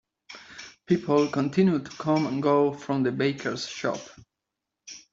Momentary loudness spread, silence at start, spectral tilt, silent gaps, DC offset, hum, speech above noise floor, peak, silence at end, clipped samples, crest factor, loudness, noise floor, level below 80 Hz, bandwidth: 20 LU; 0.3 s; -6.5 dB/octave; none; under 0.1%; none; 60 dB; -8 dBFS; 0.15 s; under 0.1%; 18 dB; -25 LUFS; -85 dBFS; -66 dBFS; 7.8 kHz